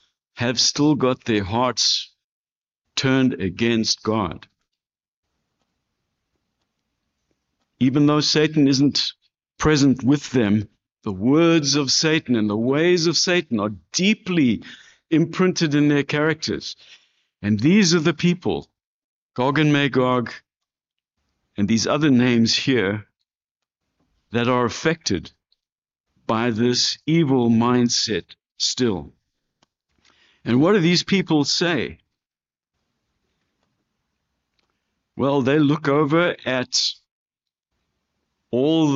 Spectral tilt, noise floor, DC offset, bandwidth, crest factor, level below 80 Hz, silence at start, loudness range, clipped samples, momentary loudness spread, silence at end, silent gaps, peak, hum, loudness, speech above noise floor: -4.5 dB/octave; under -90 dBFS; under 0.1%; 7.8 kHz; 16 dB; -54 dBFS; 0.35 s; 6 LU; under 0.1%; 10 LU; 0 s; 2.24-2.45 s, 2.52-2.61 s, 5.08-5.23 s, 18.86-19.29 s, 23.51-23.55 s, 25.72-25.82 s, 26.00-26.04 s, 37.11-37.26 s; -6 dBFS; none; -19 LUFS; over 71 dB